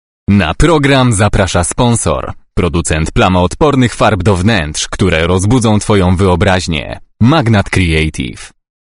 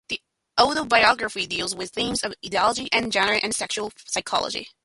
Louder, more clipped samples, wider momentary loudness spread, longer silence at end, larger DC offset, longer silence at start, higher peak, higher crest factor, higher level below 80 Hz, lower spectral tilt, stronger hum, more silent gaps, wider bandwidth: first, -11 LUFS vs -23 LUFS; first, 0.4% vs under 0.1%; about the same, 8 LU vs 10 LU; first, 0.4 s vs 0.15 s; first, 0.5% vs under 0.1%; first, 0.3 s vs 0.1 s; about the same, 0 dBFS vs -2 dBFS; second, 10 dB vs 22 dB; first, -24 dBFS vs -56 dBFS; first, -5.5 dB/octave vs -1.5 dB/octave; neither; neither; about the same, 11 kHz vs 11.5 kHz